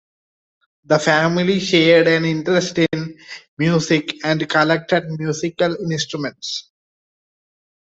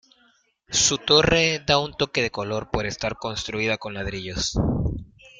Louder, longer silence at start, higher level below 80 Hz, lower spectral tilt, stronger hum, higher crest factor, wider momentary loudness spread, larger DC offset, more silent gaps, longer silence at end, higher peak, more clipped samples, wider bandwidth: first, -18 LUFS vs -22 LUFS; first, 0.9 s vs 0.7 s; second, -58 dBFS vs -40 dBFS; first, -5 dB/octave vs -3 dB/octave; neither; about the same, 18 dB vs 20 dB; about the same, 13 LU vs 12 LU; neither; first, 3.48-3.57 s vs none; first, 1.35 s vs 0.1 s; about the same, -2 dBFS vs -4 dBFS; neither; second, 8.2 kHz vs 10 kHz